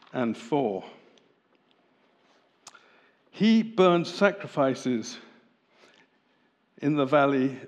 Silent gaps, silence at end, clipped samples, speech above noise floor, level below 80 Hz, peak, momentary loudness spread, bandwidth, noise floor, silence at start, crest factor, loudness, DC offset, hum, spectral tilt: none; 0 s; under 0.1%; 43 dB; -88 dBFS; -6 dBFS; 10 LU; 9.8 kHz; -68 dBFS; 0.15 s; 22 dB; -25 LUFS; under 0.1%; none; -6 dB/octave